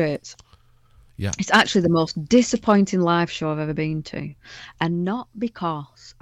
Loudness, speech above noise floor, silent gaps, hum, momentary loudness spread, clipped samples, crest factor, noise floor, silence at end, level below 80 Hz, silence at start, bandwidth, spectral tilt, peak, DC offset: -21 LUFS; 33 dB; none; none; 16 LU; under 0.1%; 18 dB; -55 dBFS; 0.1 s; -52 dBFS; 0 s; 11 kHz; -5 dB/octave; -4 dBFS; under 0.1%